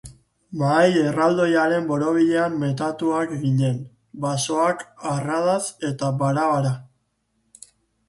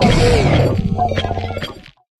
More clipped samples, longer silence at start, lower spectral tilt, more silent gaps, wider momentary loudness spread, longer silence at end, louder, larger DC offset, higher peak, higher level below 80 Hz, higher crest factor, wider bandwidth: neither; about the same, 0.05 s vs 0 s; about the same, -6 dB/octave vs -6 dB/octave; neither; second, 9 LU vs 13 LU; first, 1.25 s vs 0.4 s; second, -21 LUFS vs -16 LUFS; neither; about the same, -4 dBFS vs -2 dBFS; second, -60 dBFS vs -26 dBFS; about the same, 18 dB vs 14 dB; about the same, 11.5 kHz vs 12.5 kHz